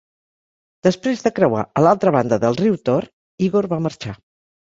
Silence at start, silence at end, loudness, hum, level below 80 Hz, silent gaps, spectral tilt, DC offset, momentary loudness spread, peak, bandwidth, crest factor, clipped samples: 0.85 s; 0.6 s; -18 LUFS; none; -56 dBFS; 3.13-3.38 s; -7 dB/octave; under 0.1%; 9 LU; -2 dBFS; 7.8 kHz; 18 dB; under 0.1%